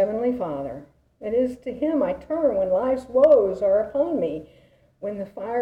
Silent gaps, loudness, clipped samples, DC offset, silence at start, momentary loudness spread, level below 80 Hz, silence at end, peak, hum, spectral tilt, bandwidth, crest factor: none; -23 LUFS; under 0.1%; under 0.1%; 0 s; 16 LU; -54 dBFS; 0 s; -6 dBFS; none; -8.5 dB/octave; 8 kHz; 16 dB